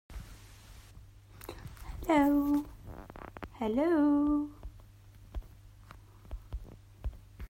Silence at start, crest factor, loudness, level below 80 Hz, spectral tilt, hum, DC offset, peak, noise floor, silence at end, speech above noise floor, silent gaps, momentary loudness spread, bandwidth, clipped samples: 0.1 s; 18 dB; -30 LUFS; -48 dBFS; -7 dB/octave; none; under 0.1%; -16 dBFS; -55 dBFS; 0.05 s; 27 dB; none; 25 LU; 16 kHz; under 0.1%